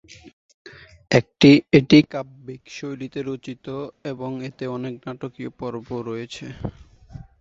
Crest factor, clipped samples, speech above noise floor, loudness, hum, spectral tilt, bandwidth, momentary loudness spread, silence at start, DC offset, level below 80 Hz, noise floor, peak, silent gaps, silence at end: 22 dB; under 0.1%; 21 dB; -21 LUFS; none; -6.5 dB/octave; 7.6 kHz; 20 LU; 0.25 s; under 0.1%; -52 dBFS; -42 dBFS; 0 dBFS; 0.33-0.65 s; 0.2 s